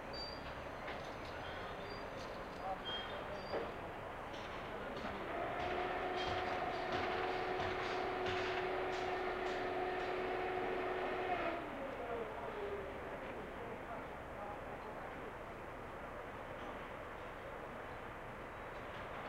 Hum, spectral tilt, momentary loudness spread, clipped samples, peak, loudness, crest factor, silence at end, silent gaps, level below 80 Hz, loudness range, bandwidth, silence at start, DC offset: none; -5 dB/octave; 9 LU; under 0.1%; -26 dBFS; -43 LUFS; 18 dB; 0 s; none; -60 dBFS; 9 LU; 16 kHz; 0 s; under 0.1%